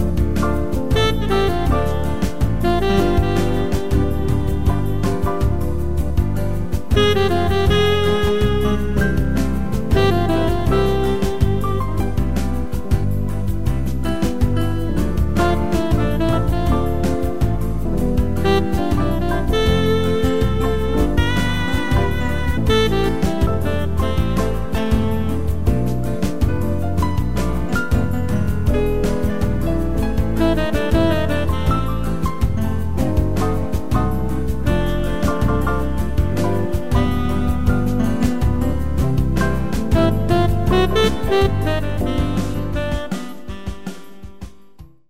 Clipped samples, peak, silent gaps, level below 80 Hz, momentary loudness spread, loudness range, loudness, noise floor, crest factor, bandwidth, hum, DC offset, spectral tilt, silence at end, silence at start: under 0.1%; -4 dBFS; none; -24 dBFS; 5 LU; 3 LU; -19 LUFS; -44 dBFS; 14 dB; 16 kHz; none; 6%; -7 dB/octave; 0 s; 0 s